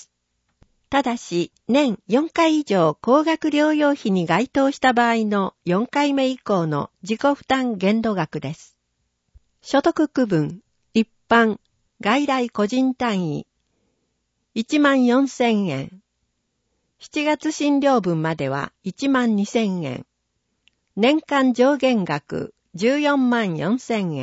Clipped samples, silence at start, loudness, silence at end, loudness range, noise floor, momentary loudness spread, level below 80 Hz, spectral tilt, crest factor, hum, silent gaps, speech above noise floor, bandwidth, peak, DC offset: under 0.1%; 0.9 s; -20 LUFS; 0 s; 4 LU; -73 dBFS; 10 LU; -60 dBFS; -5.5 dB/octave; 18 dB; none; none; 54 dB; 8 kHz; -4 dBFS; under 0.1%